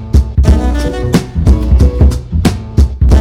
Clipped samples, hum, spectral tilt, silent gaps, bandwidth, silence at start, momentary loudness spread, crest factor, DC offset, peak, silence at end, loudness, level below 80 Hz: under 0.1%; none; -7.5 dB/octave; none; 12.5 kHz; 0 s; 4 LU; 8 dB; under 0.1%; 0 dBFS; 0 s; -12 LUFS; -12 dBFS